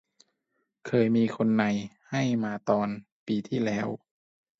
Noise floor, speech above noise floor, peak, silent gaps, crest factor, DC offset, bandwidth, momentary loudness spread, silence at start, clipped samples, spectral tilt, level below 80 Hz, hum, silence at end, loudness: -78 dBFS; 52 dB; -10 dBFS; 3.12-3.26 s; 20 dB; under 0.1%; 7.6 kHz; 10 LU; 0.85 s; under 0.1%; -7 dB/octave; -68 dBFS; none; 0.65 s; -28 LUFS